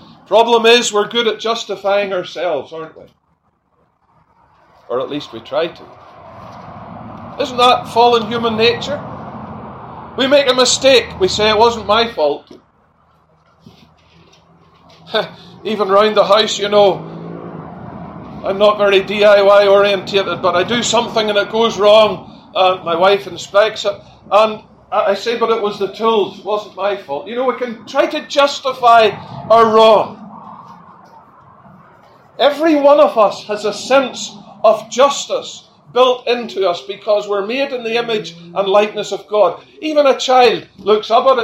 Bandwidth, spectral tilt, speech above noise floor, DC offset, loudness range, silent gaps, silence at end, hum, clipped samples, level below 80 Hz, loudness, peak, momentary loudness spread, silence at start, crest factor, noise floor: 14 kHz; -3 dB/octave; 47 dB; under 0.1%; 10 LU; none; 0 s; none; under 0.1%; -52 dBFS; -14 LUFS; 0 dBFS; 20 LU; 0.3 s; 16 dB; -61 dBFS